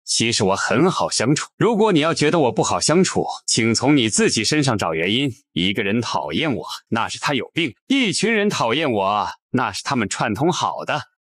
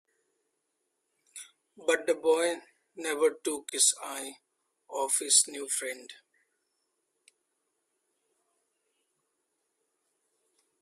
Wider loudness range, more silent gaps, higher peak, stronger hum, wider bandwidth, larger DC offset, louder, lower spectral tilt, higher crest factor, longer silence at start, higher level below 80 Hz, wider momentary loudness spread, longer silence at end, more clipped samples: about the same, 4 LU vs 5 LU; first, 1.53-1.58 s, 7.81-7.87 s, 9.42-9.49 s vs none; about the same, -6 dBFS vs -8 dBFS; neither; about the same, 14.5 kHz vs 15.5 kHz; neither; first, -19 LUFS vs -28 LUFS; first, -4 dB/octave vs 1 dB/octave; second, 14 dB vs 26 dB; second, 0.05 s vs 1.35 s; first, -56 dBFS vs -84 dBFS; second, 7 LU vs 20 LU; second, 0.2 s vs 4.7 s; neither